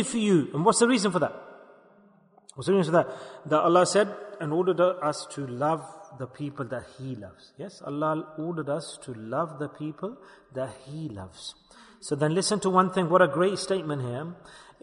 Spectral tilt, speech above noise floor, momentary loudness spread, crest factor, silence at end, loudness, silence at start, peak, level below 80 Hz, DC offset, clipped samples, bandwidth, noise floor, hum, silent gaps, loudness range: -5 dB/octave; 32 dB; 19 LU; 20 dB; 0.2 s; -26 LUFS; 0 s; -8 dBFS; -68 dBFS; under 0.1%; under 0.1%; 10.5 kHz; -59 dBFS; none; none; 9 LU